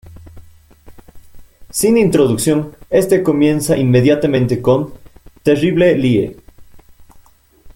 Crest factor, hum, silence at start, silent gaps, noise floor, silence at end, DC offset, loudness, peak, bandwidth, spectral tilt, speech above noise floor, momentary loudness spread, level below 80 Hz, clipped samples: 14 dB; none; 0.05 s; none; -46 dBFS; 0.05 s; under 0.1%; -14 LUFS; 0 dBFS; 17 kHz; -6 dB/octave; 33 dB; 6 LU; -44 dBFS; under 0.1%